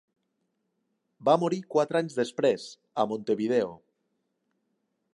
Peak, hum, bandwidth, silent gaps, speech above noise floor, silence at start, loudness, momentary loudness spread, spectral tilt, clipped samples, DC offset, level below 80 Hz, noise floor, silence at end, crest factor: -8 dBFS; none; 11.5 kHz; none; 51 dB; 1.2 s; -28 LUFS; 7 LU; -6 dB/octave; under 0.1%; under 0.1%; -78 dBFS; -78 dBFS; 1.4 s; 20 dB